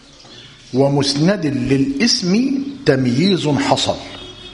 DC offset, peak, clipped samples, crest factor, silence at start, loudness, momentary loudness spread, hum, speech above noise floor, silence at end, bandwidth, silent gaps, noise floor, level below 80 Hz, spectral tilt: under 0.1%; 0 dBFS; under 0.1%; 18 dB; 0.3 s; -16 LUFS; 7 LU; none; 25 dB; 0 s; 11 kHz; none; -40 dBFS; -46 dBFS; -5 dB/octave